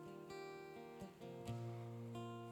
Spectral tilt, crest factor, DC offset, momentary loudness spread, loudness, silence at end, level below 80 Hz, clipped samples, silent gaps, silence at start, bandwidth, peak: -7 dB/octave; 14 dB; under 0.1%; 6 LU; -52 LUFS; 0 s; -76 dBFS; under 0.1%; none; 0 s; 17 kHz; -36 dBFS